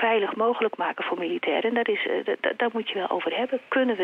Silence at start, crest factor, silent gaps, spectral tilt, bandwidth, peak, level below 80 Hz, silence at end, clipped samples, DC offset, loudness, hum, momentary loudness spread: 0 s; 16 dB; none; -6 dB/octave; 5 kHz; -10 dBFS; -78 dBFS; 0 s; under 0.1%; under 0.1%; -26 LUFS; none; 4 LU